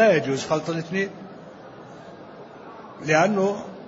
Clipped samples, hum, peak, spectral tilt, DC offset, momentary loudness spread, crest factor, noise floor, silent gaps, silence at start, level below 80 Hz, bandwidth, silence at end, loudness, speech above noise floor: under 0.1%; none; -6 dBFS; -5.5 dB/octave; under 0.1%; 23 LU; 20 dB; -42 dBFS; none; 0 s; -66 dBFS; 8 kHz; 0 s; -23 LUFS; 19 dB